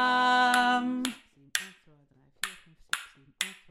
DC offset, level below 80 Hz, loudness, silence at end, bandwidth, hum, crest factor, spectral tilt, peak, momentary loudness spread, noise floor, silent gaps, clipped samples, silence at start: under 0.1%; -70 dBFS; -28 LUFS; 0.15 s; 16 kHz; none; 22 dB; -1 dB/octave; -8 dBFS; 14 LU; -63 dBFS; none; under 0.1%; 0 s